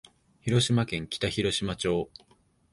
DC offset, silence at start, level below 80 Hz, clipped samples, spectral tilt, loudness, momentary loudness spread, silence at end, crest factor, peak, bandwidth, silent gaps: under 0.1%; 0.45 s; -52 dBFS; under 0.1%; -5 dB/octave; -28 LUFS; 8 LU; 0.65 s; 18 dB; -10 dBFS; 11.5 kHz; none